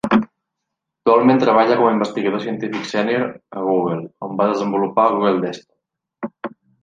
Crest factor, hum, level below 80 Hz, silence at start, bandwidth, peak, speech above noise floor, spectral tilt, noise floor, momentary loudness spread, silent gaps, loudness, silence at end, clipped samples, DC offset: 16 dB; none; -62 dBFS; 0.05 s; 9 kHz; -2 dBFS; 62 dB; -6.5 dB/octave; -80 dBFS; 17 LU; none; -18 LUFS; 0.35 s; under 0.1%; under 0.1%